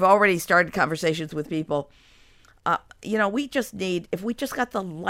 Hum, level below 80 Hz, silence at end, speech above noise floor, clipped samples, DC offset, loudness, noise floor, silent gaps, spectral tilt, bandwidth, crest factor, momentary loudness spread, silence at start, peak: none; -58 dBFS; 0 s; 31 dB; under 0.1%; under 0.1%; -24 LUFS; -55 dBFS; none; -5 dB/octave; 16 kHz; 20 dB; 11 LU; 0 s; -4 dBFS